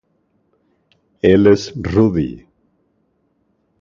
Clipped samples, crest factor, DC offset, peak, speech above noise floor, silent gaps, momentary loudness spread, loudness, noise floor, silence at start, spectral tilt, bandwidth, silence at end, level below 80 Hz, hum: under 0.1%; 18 dB; under 0.1%; 0 dBFS; 50 dB; none; 13 LU; -15 LUFS; -64 dBFS; 1.25 s; -7.5 dB/octave; 7.4 kHz; 1.45 s; -40 dBFS; none